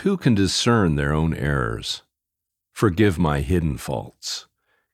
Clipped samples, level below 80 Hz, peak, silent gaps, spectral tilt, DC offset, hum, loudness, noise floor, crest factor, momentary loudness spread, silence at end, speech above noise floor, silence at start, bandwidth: under 0.1%; -36 dBFS; -4 dBFS; none; -5.5 dB/octave; under 0.1%; none; -22 LUFS; -83 dBFS; 18 dB; 11 LU; 0.5 s; 63 dB; 0 s; 15.5 kHz